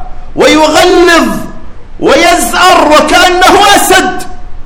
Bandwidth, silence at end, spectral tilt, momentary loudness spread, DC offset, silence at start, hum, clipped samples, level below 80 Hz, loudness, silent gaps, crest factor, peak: over 20 kHz; 0 s; -2.5 dB/octave; 12 LU; under 0.1%; 0 s; none; 10%; -24 dBFS; -5 LUFS; none; 6 dB; 0 dBFS